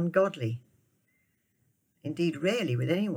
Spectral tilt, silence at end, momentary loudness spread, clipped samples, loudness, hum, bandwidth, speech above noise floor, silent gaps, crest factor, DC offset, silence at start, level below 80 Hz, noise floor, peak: -7 dB/octave; 0 s; 13 LU; under 0.1%; -30 LUFS; none; over 20 kHz; 45 dB; none; 18 dB; under 0.1%; 0 s; -76 dBFS; -73 dBFS; -12 dBFS